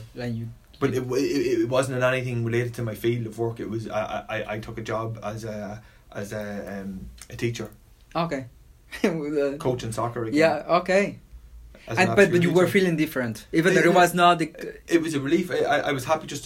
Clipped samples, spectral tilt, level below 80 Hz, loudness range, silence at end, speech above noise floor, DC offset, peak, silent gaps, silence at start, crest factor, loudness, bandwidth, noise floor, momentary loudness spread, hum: under 0.1%; -5.5 dB/octave; -52 dBFS; 12 LU; 0 s; 22 dB; under 0.1%; -4 dBFS; none; 0 s; 22 dB; -24 LUFS; 16 kHz; -46 dBFS; 16 LU; none